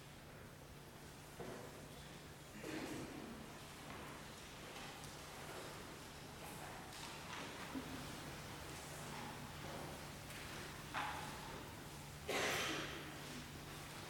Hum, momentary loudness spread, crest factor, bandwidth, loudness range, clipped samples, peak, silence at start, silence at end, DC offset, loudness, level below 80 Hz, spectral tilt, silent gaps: none; 10 LU; 22 dB; 18 kHz; 7 LU; under 0.1%; -28 dBFS; 0 s; 0 s; under 0.1%; -49 LUFS; -66 dBFS; -3.5 dB/octave; none